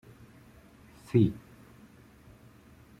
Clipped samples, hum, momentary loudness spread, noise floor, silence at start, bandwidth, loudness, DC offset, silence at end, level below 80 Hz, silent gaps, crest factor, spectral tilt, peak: under 0.1%; none; 28 LU; -56 dBFS; 1.15 s; 13.5 kHz; -28 LUFS; under 0.1%; 1.65 s; -60 dBFS; none; 24 dB; -9 dB/octave; -10 dBFS